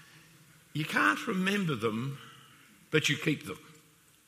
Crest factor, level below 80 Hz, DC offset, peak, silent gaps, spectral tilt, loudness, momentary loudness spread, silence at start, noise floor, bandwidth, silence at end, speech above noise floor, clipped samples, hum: 22 dB; -74 dBFS; under 0.1%; -12 dBFS; none; -4.5 dB/octave; -30 LUFS; 17 LU; 0.15 s; -62 dBFS; 15.5 kHz; 0.55 s; 32 dB; under 0.1%; none